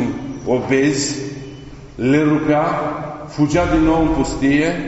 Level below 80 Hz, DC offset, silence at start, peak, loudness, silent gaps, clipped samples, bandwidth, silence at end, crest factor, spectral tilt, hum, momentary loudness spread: -34 dBFS; under 0.1%; 0 s; -4 dBFS; -17 LUFS; none; under 0.1%; 8 kHz; 0 s; 14 dB; -5.5 dB/octave; none; 14 LU